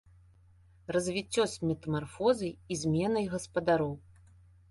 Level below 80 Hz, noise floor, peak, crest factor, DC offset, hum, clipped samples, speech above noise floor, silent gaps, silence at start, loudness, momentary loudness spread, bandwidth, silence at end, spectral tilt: -58 dBFS; -60 dBFS; -14 dBFS; 18 dB; under 0.1%; none; under 0.1%; 30 dB; none; 0.9 s; -31 LUFS; 7 LU; 11.5 kHz; 0.7 s; -5.5 dB/octave